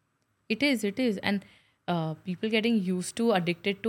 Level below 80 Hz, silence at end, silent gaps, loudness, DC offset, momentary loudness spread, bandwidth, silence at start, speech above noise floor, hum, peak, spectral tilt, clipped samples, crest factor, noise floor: -72 dBFS; 0 s; none; -28 LUFS; under 0.1%; 8 LU; 16.5 kHz; 0.5 s; 44 dB; none; -10 dBFS; -5 dB/octave; under 0.1%; 20 dB; -72 dBFS